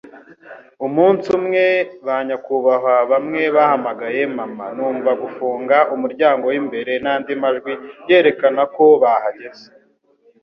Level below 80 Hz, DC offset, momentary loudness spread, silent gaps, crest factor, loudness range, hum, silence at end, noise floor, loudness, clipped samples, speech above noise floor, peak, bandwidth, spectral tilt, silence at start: -64 dBFS; under 0.1%; 10 LU; none; 16 dB; 2 LU; none; 0.8 s; -57 dBFS; -17 LUFS; under 0.1%; 40 dB; -2 dBFS; 6.6 kHz; -7 dB/octave; 0.05 s